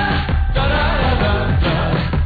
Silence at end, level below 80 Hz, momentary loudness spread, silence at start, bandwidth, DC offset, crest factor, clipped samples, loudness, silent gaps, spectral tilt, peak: 0 s; -20 dBFS; 2 LU; 0 s; 4.9 kHz; under 0.1%; 10 dB; under 0.1%; -17 LUFS; none; -9 dB/octave; -6 dBFS